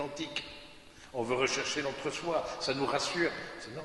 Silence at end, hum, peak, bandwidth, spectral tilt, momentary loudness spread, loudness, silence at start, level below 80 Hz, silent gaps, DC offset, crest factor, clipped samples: 0 s; none; -14 dBFS; 11.5 kHz; -3 dB/octave; 15 LU; -33 LUFS; 0 s; -62 dBFS; none; under 0.1%; 20 dB; under 0.1%